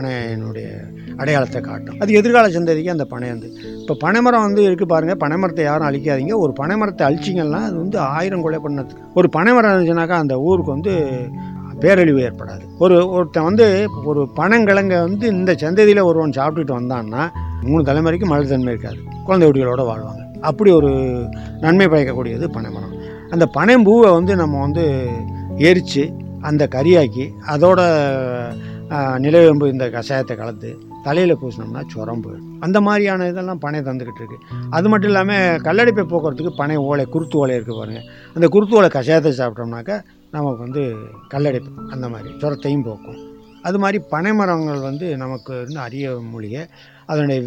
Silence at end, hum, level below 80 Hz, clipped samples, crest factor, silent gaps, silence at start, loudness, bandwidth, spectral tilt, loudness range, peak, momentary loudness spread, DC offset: 0 s; none; -46 dBFS; under 0.1%; 16 dB; none; 0 s; -16 LUFS; 9.2 kHz; -7.5 dB/octave; 7 LU; 0 dBFS; 16 LU; under 0.1%